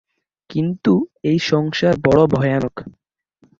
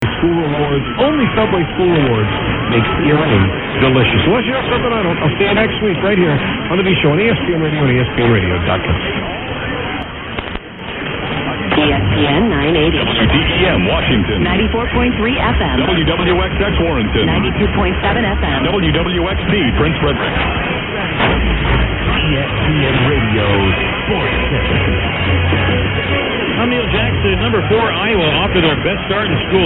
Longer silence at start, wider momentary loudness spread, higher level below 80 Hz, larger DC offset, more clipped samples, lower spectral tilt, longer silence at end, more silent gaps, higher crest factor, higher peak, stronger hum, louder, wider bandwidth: first, 0.5 s vs 0 s; first, 11 LU vs 5 LU; second, -48 dBFS vs -24 dBFS; neither; neither; second, -7 dB/octave vs -9 dB/octave; first, 0.7 s vs 0 s; neither; about the same, 16 dB vs 14 dB; about the same, -2 dBFS vs 0 dBFS; neither; second, -18 LUFS vs -14 LUFS; first, 7.6 kHz vs 4.1 kHz